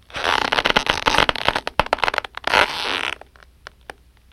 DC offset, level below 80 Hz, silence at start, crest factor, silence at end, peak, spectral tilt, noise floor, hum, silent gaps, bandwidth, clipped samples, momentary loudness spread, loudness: under 0.1%; -40 dBFS; 0.1 s; 22 dB; 1.2 s; 0 dBFS; -2.5 dB/octave; -47 dBFS; none; none; 16.5 kHz; under 0.1%; 9 LU; -19 LUFS